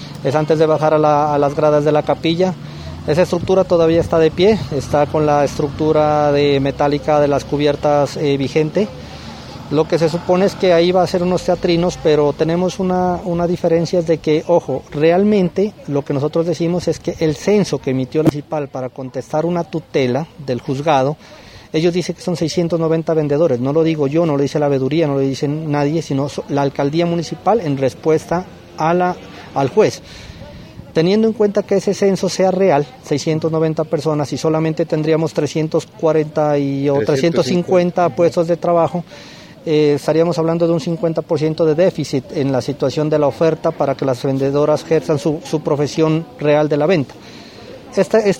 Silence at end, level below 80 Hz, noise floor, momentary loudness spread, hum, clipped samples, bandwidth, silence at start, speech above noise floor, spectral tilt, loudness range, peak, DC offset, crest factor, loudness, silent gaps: 0 s; -46 dBFS; -36 dBFS; 8 LU; none; under 0.1%; 15.5 kHz; 0 s; 20 dB; -6.5 dB/octave; 3 LU; 0 dBFS; under 0.1%; 16 dB; -16 LUFS; none